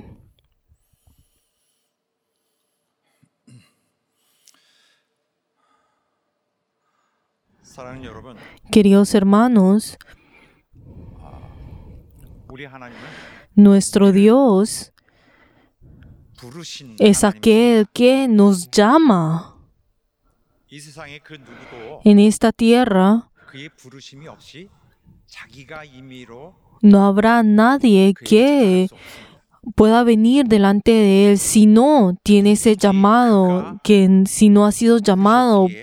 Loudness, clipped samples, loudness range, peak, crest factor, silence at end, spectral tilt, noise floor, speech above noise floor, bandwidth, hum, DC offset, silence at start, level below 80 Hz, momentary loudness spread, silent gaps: -14 LUFS; under 0.1%; 7 LU; 0 dBFS; 16 dB; 0 s; -6 dB/octave; -75 dBFS; 61 dB; 14.5 kHz; none; under 0.1%; 7.8 s; -48 dBFS; 13 LU; none